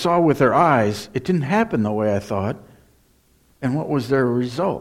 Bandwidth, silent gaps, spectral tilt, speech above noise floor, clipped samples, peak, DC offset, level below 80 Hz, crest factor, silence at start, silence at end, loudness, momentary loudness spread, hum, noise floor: 16 kHz; none; -7 dB/octave; 39 dB; under 0.1%; -4 dBFS; under 0.1%; -54 dBFS; 16 dB; 0 s; 0 s; -20 LUFS; 10 LU; none; -58 dBFS